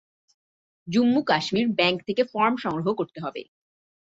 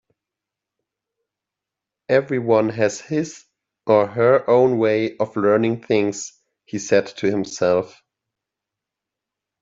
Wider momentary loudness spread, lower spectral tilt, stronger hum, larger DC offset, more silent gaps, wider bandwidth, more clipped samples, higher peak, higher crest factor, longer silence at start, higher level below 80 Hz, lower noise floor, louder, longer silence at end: second, 11 LU vs 14 LU; about the same, -5.5 dB/octave vs -5.5 dB/octave; neither; neither; neither; about the same, 7.8 kHz vs 7.8 kHz; neither; about the same, -6 dBFS vs -4 dBFS; about the same, 18 dB vs 18 dB; second, 0.85 s vs 2.1 s; about the same, -68 dBFS vs -66 dBFS; first, under -90 dBFS vs -86 dBFS; second, -24 LUFS vs -19 LUFS; second, 0.7 s vs 1.75 s